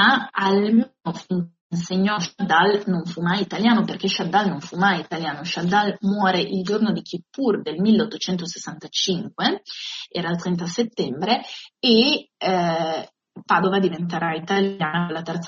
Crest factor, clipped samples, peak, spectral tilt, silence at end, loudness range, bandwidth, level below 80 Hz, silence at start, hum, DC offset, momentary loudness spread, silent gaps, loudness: 18 dB; under 0.1%; -4 dBFS; -3.5 dB/octave; 0 s; 3 LU; 7.4 kHz; -64 dBFS; 0 s; none; under 0.1%; 10 LU; 1.61-1.70 s; -22 LUFS